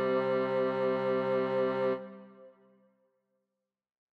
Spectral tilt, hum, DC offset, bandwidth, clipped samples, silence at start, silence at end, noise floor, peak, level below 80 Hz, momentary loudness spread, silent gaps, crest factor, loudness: -8 dB/octave; none; under 0.1%; 5.4 kHz; under 0.1%; 0 s; 1.7 s; -87 dBFS; -20 dBFS; -76 dBFS; 8 LU; none; 14 dB; -31 LUFS